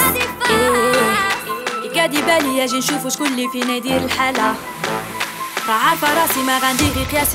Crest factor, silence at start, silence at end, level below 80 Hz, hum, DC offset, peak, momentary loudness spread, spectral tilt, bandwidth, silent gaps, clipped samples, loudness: 16 dB; 0 s; 0 s; -40 dBFS; none; under 0.1%; -2 dBFS; 8 LU; -3 dB/octave; 16.5 kHz; none; under 0.1%; -17 LUFS